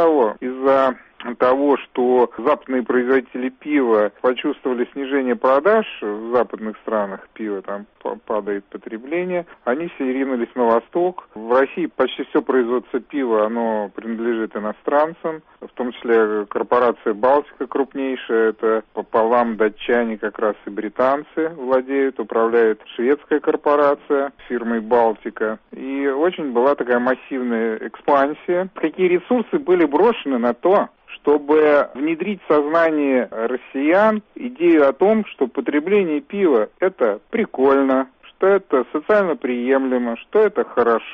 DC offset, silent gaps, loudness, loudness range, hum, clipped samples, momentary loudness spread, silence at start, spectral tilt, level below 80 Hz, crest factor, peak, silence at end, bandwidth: under 0.1%; none; -19 LUFS; 4 LU; none; under 0.1%; 10 LU; 0 s; -8 dB/octave; -60 dBFS; 14 dB; -4 dBFS; 0 s; 5.4 kHz